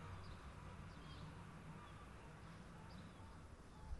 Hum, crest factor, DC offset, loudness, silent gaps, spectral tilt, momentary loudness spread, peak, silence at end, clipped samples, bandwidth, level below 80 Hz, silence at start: none; 16 dB; under 0.1%; -58 LUFS; none; -6 dB/octave; 4 LU; -40 dBFS; 0 s; under 0.1%; 11.5 kHz; -60 dBFS; 0 s